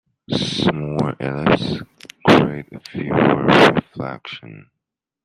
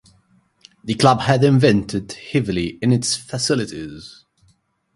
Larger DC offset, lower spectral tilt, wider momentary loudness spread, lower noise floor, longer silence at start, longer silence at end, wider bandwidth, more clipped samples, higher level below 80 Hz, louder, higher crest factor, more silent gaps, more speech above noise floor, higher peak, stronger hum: neither; about the same, -6 dB/octave vs -5.5 dB/octave; first, 19 LU vs 16 LU; first, -82 dBFS vs -61 dBFS; second, 0.3 s vs 0.85 s; second, 0.65 s vs 0.9 s; first, 13.5 kHz vs 11.5 kHz; neither; about the same, -48 dBFS vs -48 dBFS; about the same, -17 LUFS vs -18 LUFS; about the same, 18 dB vs 20 dB; neither; first, 63 dB vs 43 dB; about the same, -2 dBFS vs 0 dBFS; neither